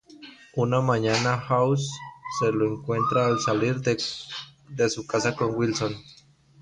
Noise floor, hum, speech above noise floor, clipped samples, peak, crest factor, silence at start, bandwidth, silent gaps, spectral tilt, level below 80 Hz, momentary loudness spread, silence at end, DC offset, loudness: -48 dBFS; none; 23 dB; under 0.1%; -10 dBFS; 16 dB; 0.1 s; 10.5 kHz; none; -5 dB/octave; -58 dBFS; 14 LU; 0.5 s; under 0.1%; -25 LUFS